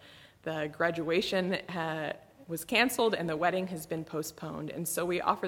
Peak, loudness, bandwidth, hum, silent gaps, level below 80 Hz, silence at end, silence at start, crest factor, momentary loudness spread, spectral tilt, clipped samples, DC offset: -10 dBFS; -32 LUFS; 17.5 kHz; none; none; -66 dBFS; 0 s; 0 s; 22 dB; 12 LU; -4 dB/octave; under 0.1%; under 0.1%